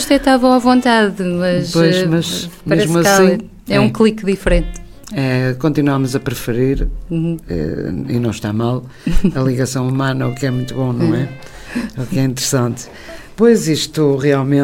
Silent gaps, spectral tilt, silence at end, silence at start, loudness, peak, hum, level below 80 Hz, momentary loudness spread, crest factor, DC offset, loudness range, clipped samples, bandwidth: none; -5.5 dB/octave; 0 s; 0 s; -16 LUFS; 0 dBFS; none; -28 dBFS; 11 LU; 14 dB; under 0.1%; 5 LU; under 0.1%; 16.5 kHz